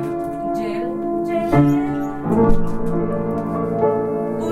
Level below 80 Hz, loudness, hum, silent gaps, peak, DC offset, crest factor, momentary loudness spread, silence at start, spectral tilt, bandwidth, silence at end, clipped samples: -30 dBFS; -20 LUFS; none; none; -2 dBFS; under 0.1%; 16 dB; 8 LU; 0 s; -9 dB/octave; 12 kHz; 0 s; under 0.1%